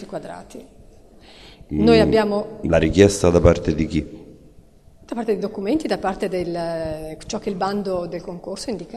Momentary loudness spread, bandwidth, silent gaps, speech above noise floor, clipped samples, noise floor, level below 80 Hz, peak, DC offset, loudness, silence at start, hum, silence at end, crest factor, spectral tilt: 17 LU; 13 kHz; none; 29 dB; under 0.1%; -49 dBFS; -38 dBFS; 0 dBFS; 0.2%; -20 LUFS; 0 s; none; 0 s; 20 dB; -6 dB/octave